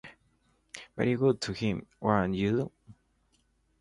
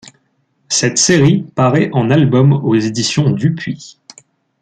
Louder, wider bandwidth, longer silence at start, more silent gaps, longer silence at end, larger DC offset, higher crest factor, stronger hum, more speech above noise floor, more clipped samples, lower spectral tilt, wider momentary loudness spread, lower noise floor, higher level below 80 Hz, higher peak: second, -30 LUFS vs -13 LUFS; first, 11.5 kHz vs 9.4 kHz; about the same, 0.05 s vs 0.05 s; neither; first, 0.9 s vs 0.7 s; neither; first, 22 dB vs 14 dB; neither; second, 42 dB vs 49 dB; neither; first, -6.5 dB/octave vs -5 dB/octave; first, 16 LU vs 7 LU; first, -71 dBFS vs -61 dBFS; second, -56 dBFS vs -50 dBFS; second, -10 dBFS vs 0 dBFS